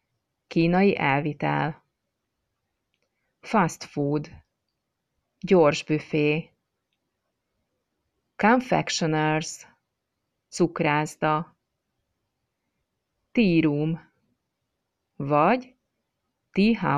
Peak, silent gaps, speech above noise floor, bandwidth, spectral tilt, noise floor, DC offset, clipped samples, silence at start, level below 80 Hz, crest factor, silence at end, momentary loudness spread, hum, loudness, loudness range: -8 dBFS; none; 58 dB; 13 kHz; -6 dB/octave; -80 dBFS; under 0.1%; under 0.1%; 0.5 s; -58 dBFS; 18 dB; 0 s; 11 LU; none; -24 LUFS; 4 LU